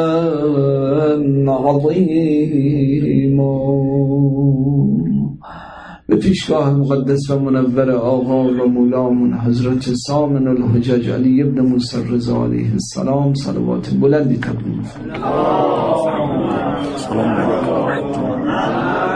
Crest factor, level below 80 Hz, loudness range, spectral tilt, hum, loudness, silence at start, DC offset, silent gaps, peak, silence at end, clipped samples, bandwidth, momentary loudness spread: 12 dB; -42 dBFS; 3 LU; -8 dB/octave; none; -16 LUFS; 0 s; under 0.1%; none; -2 dBFS; 0 s; under 0.1%; 10 kHz; 5 LU